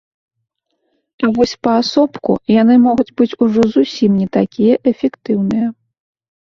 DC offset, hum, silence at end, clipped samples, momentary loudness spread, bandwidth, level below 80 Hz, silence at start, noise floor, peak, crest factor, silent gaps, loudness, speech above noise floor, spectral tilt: under 0.1%; none; 0.85 s; under 0.1%; 8 LU; 7.2 kHz; -52 dBFS; 1.2 s; -71 dBFS; -2 dBFS; 14 dB; none; -14 LUFS; 58 dB; -7 dB/octave